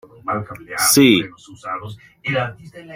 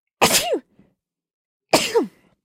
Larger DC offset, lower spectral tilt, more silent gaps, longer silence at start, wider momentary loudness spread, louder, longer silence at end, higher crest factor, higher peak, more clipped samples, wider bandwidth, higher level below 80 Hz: neither; first, -3.5 dB/octave vs -2 dB/octave; second, none vs 1.34-1.60 s; about the same, 0.25 s vs 0.2 s; first, 19 LU vs 11 LU; about the same, -17 LUFS vs -19 LUFS; second, 0 s vs 0.35 s; about the same, 18 dB vs 20 dB; about the same, -2 dBFS vs -2 dBFS; neither; about the same, 16 kHz vs 16.5 kHz; about the same, -56 dBFS vs -56 dBFS